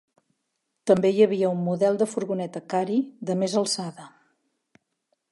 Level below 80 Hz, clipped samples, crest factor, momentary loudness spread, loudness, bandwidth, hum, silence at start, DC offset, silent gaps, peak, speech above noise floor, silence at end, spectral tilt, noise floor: -72 dBFS; under 0.1%; 20 dB; 9 LU; -24 LUFS; 11.5 kHz; none; 0.85 s; under 0.1%; none; -6 dBFS; 55 dB; 1.25 s; -5.5 dB/octave; -78 dBFS